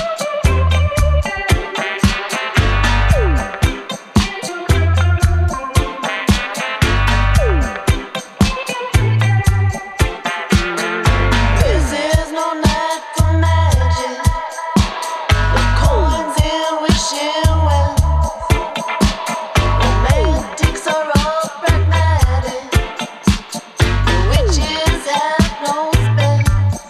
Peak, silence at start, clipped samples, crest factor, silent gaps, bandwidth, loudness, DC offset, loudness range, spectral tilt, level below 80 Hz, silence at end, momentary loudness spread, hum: 0 dBFS; 0 s; under 0.1%; 14 dB; none; 14.5 kHz; -16 LUFS; under 0.1%; 1 LU; -5 dB/octave; -20 dBFS; 0 s; 5 LU; none